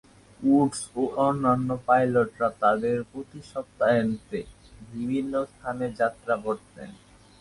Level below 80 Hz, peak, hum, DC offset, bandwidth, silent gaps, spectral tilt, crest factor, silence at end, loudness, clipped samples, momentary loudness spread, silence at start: -58 dBFS; -6 dBFS; none; under 0.1%; 11.5 kHz; none; -6.5 dB/octave; 20 dB; 0.5 s; -26 LUFS; under 0.1%; 16 LU; 0.4 s